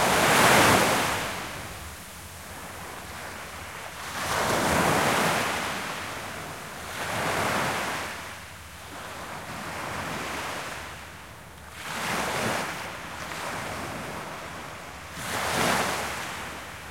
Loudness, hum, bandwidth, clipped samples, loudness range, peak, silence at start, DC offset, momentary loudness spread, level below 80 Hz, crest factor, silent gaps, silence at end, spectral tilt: -27 LUFS; none; 16.5 kHz; under 0.1%; 8 LU; -6 dBFS; 0 s; 0.1%; 17 LU; -52 dBFS; 22 dB; none; 0 s; -3 dB/octave